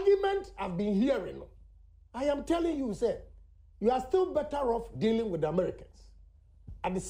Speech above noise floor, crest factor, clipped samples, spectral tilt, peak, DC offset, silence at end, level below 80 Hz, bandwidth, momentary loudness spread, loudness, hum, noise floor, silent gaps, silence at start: 26 dB; 16 dB; under 0.1%; -6.5 dB/octave; -16 dBFS; under 0.1%; 0 s; -52 dBFS; 11 kHz; 10 LU; -31 LUFS; none; -57 dBFS; none; 0 s